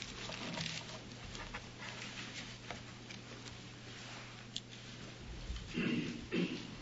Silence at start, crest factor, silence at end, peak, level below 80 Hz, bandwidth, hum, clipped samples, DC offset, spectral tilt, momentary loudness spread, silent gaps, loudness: 0 s; 24 dB; 0 s; -20 dBFS; -58 dBFS; 7.6 kHz; none; under 0.1%; under 0.1%; -3.5 dB/octave; 11 LU; none; -44 LUFS